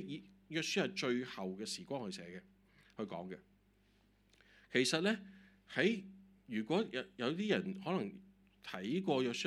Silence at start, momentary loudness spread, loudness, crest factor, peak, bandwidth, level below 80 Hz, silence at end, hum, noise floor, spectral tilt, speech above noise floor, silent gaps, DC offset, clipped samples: 0 s; 17 LU; -39 LUFS; 22 dB; -18 dBFS; 13.5 kHz; -76 dBFS; 0 s; none; -72 dBFS; -4.5 dB/octave; 33 dB; none; under 0.1%; under 0.1%